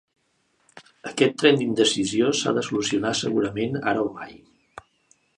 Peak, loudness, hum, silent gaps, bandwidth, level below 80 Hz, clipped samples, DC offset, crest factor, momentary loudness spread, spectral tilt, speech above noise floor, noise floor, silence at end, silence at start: -4 dBFS; -22 LUFS; none; none; 11.5 kHz; -62 dBFS; under 0.1%; under 0.1%; 22 dB; 13 LU; -4 dB/octave; 45 dB; -68 dBFS; 0.6 s; 0.75 s